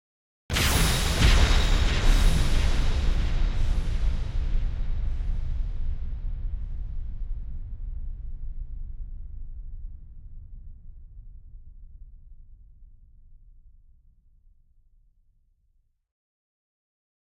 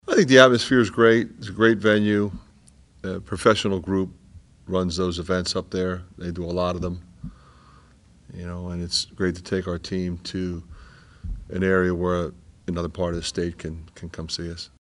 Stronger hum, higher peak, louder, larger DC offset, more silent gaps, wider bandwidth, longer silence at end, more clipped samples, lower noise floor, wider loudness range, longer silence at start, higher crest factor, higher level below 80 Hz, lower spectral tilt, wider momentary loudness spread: neither; second, -6 dBFS vs 0 dBFS; second, -28 LUFS vs -23 LUFS; neither; neither; first, 16.5 kHz vs 11.5 kHz; first, 4 s vs 0.15 s; neither; first, -68 dBFS vs -53 dBFS; first, 24 LU vs 8 LU; first, 0.5 s vs 0.05 s; about the same, 20 dB vs 24 dB; first, -28 dBFS vs -46 dBFS; about the same, -4 dB/octave vs -5 dB/octave; first, 25 LU vs 19 LU